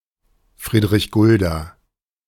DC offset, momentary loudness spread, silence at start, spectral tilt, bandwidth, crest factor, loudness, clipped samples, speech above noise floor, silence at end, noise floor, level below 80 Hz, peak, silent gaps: under 0.1%; 17 LU; 0.6 s; -6.5 dB/octave; 17.5 kHz; 16 dB; -17 LUFS; under 0.1%; 53 dB; 0.55 s; -69 dBFS; -38 dBFS; -4 dBFS; none